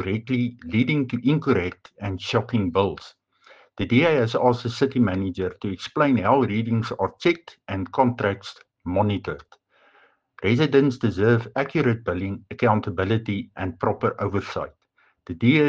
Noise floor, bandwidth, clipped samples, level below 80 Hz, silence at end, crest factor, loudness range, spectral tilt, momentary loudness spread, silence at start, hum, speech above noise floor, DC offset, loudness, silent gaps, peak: -59 dBFS; 7.6 kHz; under 0.1%; -54 dBFS; 0 s; 18 dB; 4 LU; -7.5 dB/octave; 12 LU; 0 s; none; 37 dB; under 0.1%; -23 LUFS; none; -4 dBFS